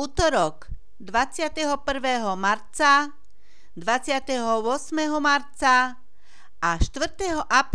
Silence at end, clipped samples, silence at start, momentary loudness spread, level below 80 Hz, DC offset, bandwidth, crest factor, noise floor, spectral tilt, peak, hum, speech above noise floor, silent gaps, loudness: 0.1 s; under 0.1%; 0 s; 8 LU; -38 dBFS; 2%; 11 kHz; 20 dB; -60 dBFS; -3.5 dB/octave; -4 dBFS; none; 37 dB; none; -23 LUFS